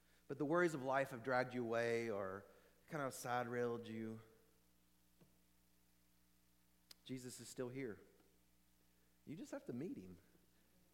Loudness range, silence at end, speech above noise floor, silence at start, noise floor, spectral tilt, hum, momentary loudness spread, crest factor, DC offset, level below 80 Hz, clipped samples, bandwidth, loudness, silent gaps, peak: 16 LU; 0.75 s; 33 dB; 0.3 s; -77 dBFS; -5.5 dB/octave; 60 Hz at -75 dBFS; 16 LU; 22 dB; under 0.1%; -82 dBFS; under 0.1%; 16.5 kHz; -44 LUFS; none; -24 dBFS